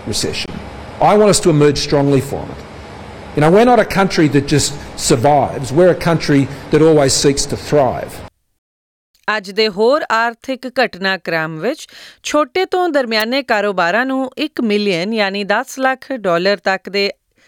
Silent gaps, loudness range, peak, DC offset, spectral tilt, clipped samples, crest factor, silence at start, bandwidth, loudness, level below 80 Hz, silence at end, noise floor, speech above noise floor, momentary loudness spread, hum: 8.58-9.14 s; 4 LU; -2 dBFS; under 0.1%; -4.5 dB/octave; under 0.1%; 14 dB; 0 s; 19.5 kHz; -15 LUFS; -40 dBFS; 0.35 s; under -90 dBFS; over 76 dB; 14 LU; none